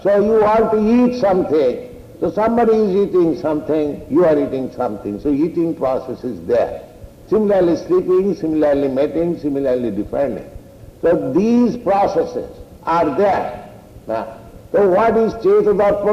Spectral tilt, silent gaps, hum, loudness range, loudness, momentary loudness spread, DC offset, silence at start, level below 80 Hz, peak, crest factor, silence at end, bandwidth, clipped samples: -8 dB/octave; none; none; 3 LU; -17 LUFS; 11 LU; under 0.1%; 0 s; -44 dBFS; -6 dBFS; 10 dB; 0 s; 14 kHz; under 0.1%